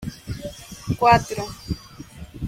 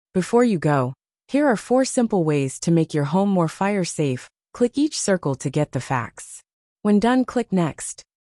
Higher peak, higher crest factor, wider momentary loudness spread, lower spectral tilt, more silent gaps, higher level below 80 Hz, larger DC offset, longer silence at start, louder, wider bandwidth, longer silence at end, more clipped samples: about the same, -4 dBFS vs -6 dBFS; first, 20 dB vs 14 dB; first, 23 LU vs 9 LU; about the same, -5.5 dB/octave vs -6 dB/octave; second, none vs 6.53-6.76 s; first, -42 dBFS vs -58 dBFS; neither; second, 0 s vs 0.15 s; about the same, -22 LUFS vs -21 LUFS; first, 16.5 kHz vs 12 kHz; second, 0 s vs 0.35 s; neither